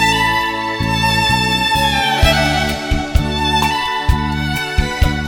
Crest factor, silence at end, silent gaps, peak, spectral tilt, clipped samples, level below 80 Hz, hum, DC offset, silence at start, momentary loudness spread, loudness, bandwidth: 16 dB; 0 s; none; 0 dBFS; -4 dB/octave; under 0.1%; -22 dBFS; none; under 0.1%; 0 s; 6 LU; -15 LUFS; 17.5 kHz